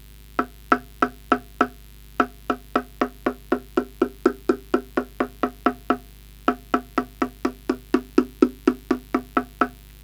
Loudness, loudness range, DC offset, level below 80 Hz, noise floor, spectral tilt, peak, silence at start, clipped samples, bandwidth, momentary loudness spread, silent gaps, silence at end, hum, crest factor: -25 LUFS; 2 LU; under 0.1%; -46 dBFS; -44 dBFS; -5.5 dB/octave; -2 dBFS; 0.35 s; under 0.1%; over 20 kHz; 7 LU; none; 0.15 s; 50 Hz at -45 dBFS; 24 dB